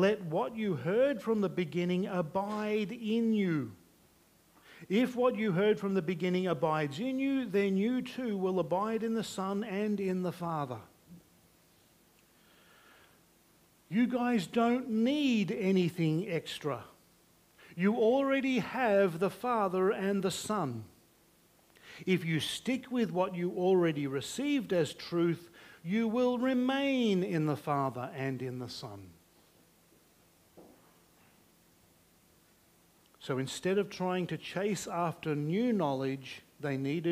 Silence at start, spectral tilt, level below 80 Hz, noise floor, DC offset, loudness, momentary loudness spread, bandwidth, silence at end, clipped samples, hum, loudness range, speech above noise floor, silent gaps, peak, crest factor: 0 s; -6 dB/octave; -72 dBFS; -65 dBFS; under 0.1%; -32 LUFS; 8 LU; 15.5 kHz; 0 s; under 0.1%; none; 8 LU; 34 dB; none; -16 dBFS; 18 dB